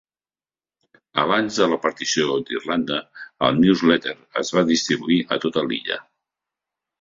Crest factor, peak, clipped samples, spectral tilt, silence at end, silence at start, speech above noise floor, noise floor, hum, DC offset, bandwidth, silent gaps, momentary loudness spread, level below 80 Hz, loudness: 20 dB; -2 dBFS; under 0.1%; -4 dB/octave; 1 s; 1.15 s; over 69 dB; under -90 dBFS; none; under 0.1%; 7.8 kHz; none; 10 LU; -60 dBFS; -21 LUFS